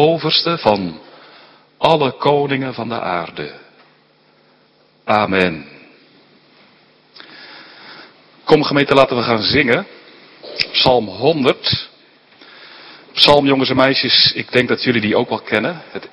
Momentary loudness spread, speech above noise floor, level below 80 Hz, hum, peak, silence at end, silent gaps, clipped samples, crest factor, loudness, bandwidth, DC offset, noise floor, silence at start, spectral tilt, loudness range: 20 LU; 39 dB; -50 dBFS; none; 0 dBFS; 0.05 s; none; 0.1%; 18 dB; -15 LUFS; 11 kHz; under 0.1%; -54 dBFS; 0 s; -6 dB/octave; 9 LU